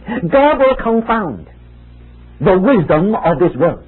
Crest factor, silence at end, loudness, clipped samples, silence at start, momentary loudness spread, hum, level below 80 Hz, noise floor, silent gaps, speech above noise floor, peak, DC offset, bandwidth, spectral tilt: 14 dB; 0.1 s; -13 LUFS; under 0.1%; 0.05 s; 7 LU; none; -36 dBFS; -38 dBFS; none; 26 dB; 0 dBFS; under 0.1%; 4.2 kHz; -13 dB/octave